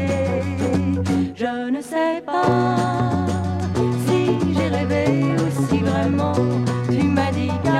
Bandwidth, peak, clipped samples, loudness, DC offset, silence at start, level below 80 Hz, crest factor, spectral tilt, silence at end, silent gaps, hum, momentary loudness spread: 13.5 kHz; -4 dBFS; under 0.1%; -20 LUFS; under 0.1%; 0 s; -46 dBFS; 14 dB; -7 dB/octave; 0 s; none; none; 4 LU